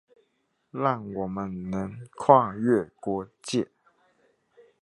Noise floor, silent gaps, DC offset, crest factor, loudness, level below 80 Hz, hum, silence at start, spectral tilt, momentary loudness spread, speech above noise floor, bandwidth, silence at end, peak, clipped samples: -73 dBFS; none; under 0.1%; 26 dB; -26 LUFS; -60 dBFS; none; 0.75 s; -6.5 dB/octave; 13 LU; 48 dB; 11.5 kHz; 1.15 s; -2 dBFS; under 0.1%